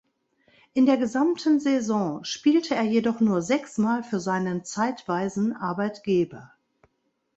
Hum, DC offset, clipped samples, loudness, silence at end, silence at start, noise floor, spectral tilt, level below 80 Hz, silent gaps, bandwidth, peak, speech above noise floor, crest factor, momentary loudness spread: none; under 0.1%; under 0.1%; -25 LUFS; 0.9 s; 0.75 s; -74 dBFS; -5.5 dB/octave; -66 dBFS; none; 8.2 kHz; -10 dBFS; 50 dB; 16 dB; 6 LU